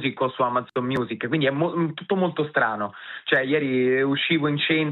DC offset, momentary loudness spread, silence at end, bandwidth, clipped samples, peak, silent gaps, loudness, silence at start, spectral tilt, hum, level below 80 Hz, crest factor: under 0.1%; 5 LU; 0 s; 4.8 kHz; under 0.1%; -6 dBFS; none; -23 LUFS; 0 s; -3.5 dB/octave; none; -68 dBFS; 18 dB